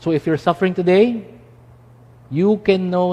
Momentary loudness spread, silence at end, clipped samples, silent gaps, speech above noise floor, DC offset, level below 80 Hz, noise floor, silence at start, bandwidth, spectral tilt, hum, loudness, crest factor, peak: 6 LU; 0 s; under 0.1%; none; 29 dB; under 0.1%; -54 dBFS; -46 dBFS; 0 s; 9.2 kHz; -8 dB/octave; none; -17 LUFS; 18 dB; 0 dBFS